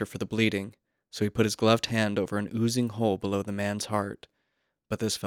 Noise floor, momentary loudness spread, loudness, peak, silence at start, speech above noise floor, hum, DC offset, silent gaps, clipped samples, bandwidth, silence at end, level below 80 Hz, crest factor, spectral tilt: -78 dBFS; 12 LU; -28 LUFS; -6 dBFS; 0 s; 50 dB; none; under 0.1%; none; under 0.1%; 18 kHz; 0 s; -62 dBFS; 22 dB; -5 dB/octave